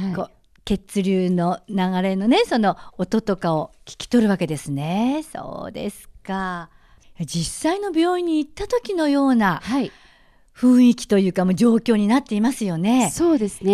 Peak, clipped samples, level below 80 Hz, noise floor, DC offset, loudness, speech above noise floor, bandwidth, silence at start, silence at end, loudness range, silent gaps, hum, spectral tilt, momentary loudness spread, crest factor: -6 dBFS; under 0.1%; -48 dBFS; -53 dBFS; under 0.1%; -20 LUFS; 34 dB; 14 kHz; 0 s; 0 s; 7 LU; none; none; -6 dB/octave; 13 LU; 14 dB